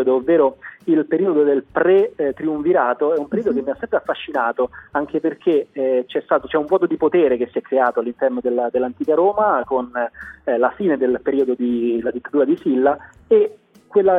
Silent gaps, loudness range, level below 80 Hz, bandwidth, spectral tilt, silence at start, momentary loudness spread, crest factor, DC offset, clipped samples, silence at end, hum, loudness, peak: none; 2 LU; -56 dBFS; 3.9 kHz; -8.5 dB/octave; 0 s; 7 LU; 16 dB; under 0.1%; under 0.1%; 0 s; none; -19 LUFS; -4 dBFS